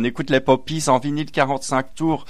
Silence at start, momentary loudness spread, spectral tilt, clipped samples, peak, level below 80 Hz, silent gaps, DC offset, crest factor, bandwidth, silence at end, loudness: 0 s; 5 LU; -5 dB/octave; under 0.1%; -4 dBFS; -48 dBFS; none; 2%; 16 dB; 14.5 kHz; 0.05 s; -20 LUFS